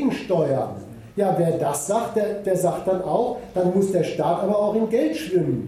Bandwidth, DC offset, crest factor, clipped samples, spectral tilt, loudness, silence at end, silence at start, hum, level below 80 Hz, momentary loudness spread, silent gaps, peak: 15.5 kHz; under 0.1%; 14 dB; under 0.1%; -6.5 dB/octave; -22 LUFS; 0 s; 0 s; none; -56 dBFS; 4 LU; none; -8 dBFS